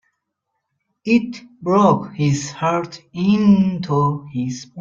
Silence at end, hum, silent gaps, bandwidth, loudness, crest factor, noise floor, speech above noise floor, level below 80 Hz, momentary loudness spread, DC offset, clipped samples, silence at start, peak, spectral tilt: 0 s; none; none; 7.6 kHz; -18 LUFS; 16 dB; -76 dBFS; 58 dB; -54 dBFS; 13 LU; under 0.1%; under 0.1%; 1.05 s; -2 dBFS; -7 dB/octave